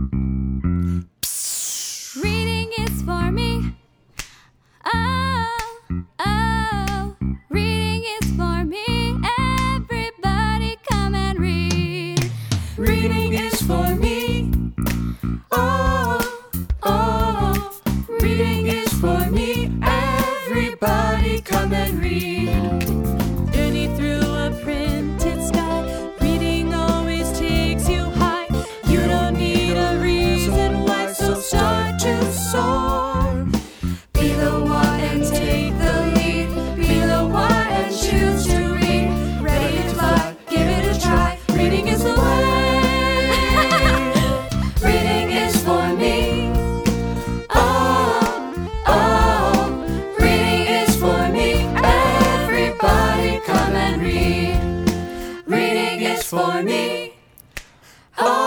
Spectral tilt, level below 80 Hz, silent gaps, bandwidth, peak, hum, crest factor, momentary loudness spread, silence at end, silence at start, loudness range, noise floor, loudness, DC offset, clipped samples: -5 dB/octave; -26 dBFS; none; over 20 kHz; -2 dBFS; none; 18 dB; 7 LU; 0 s; 0 s; 5 LU; -53 dBFS; -20 LUFS; under 0.1%; under 0.1%